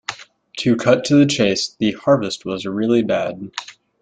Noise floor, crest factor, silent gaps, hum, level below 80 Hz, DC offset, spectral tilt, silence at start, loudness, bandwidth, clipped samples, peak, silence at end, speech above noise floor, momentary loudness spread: -37 dBFS; 18 dB; none; none; -58 dBFS; under 0.1%; -5 dB/octave; 0.1 s; -18 LUFS; 9.4 kHz; under 0.1%; -2 dBFS; 0.3 s; 19 dB; 16 LU